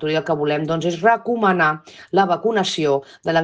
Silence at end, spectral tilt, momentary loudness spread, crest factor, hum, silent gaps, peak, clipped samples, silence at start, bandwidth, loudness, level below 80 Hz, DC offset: 0 s; -5 dB/octave; 5 LU; 16 dB; none; none; -4 dBFS; under 0.1%; 0 s; 9.6 kHz; -19 LUFS; -62 dBFS; under 0.1%